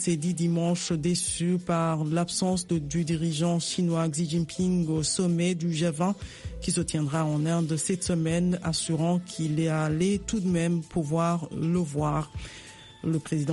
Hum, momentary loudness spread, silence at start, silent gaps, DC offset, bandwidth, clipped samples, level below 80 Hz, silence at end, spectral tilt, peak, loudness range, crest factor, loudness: none; 4 LU; 0 s; none; under 0.1%; 11.5 kHz; under 0.1%; -50 dBFS; 0 s; -5.5 dB/octave; -14 dBFS; 1 LU; 12 dB; -27 LUFS